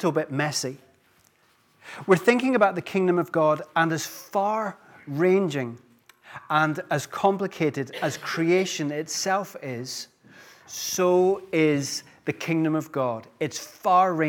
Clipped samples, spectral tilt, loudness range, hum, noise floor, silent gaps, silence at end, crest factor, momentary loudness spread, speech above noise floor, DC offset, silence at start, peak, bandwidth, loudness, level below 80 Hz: under 0.1%; -5 dB/octave; 3 LU; none; -63 dBFS; none; 0 s; 20 dB; 14 LU; 39 dB; under 0.1%; 0 s; -4 dBFS; 18.5 kHz; -25 LUFS; -76 dBFS